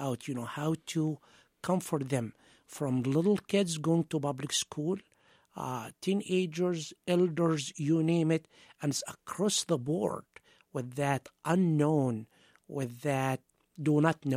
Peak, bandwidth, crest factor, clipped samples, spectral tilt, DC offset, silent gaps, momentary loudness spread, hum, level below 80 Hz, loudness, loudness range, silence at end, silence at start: -12 dBFS; 15.5 kHz; 20 dB; under 0.1%; -5.5 dB/octave; under 0.1%; none; 11 LU; none; -72 dBFS; -32 LUFS; 2 LU; 0 s; 0 s